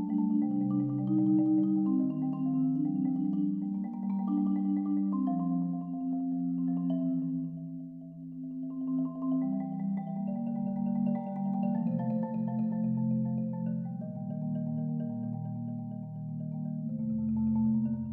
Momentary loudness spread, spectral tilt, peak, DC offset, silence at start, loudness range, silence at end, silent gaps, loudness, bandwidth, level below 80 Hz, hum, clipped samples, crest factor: 9 LU; -13.5 dB/octave; -18 dBFS; under 0.1%; 0 s; 6 LU; 0 s; none; -32 LUFS; 3.1 kHz; -68 dBFS; none; under 0.1%; 14 dB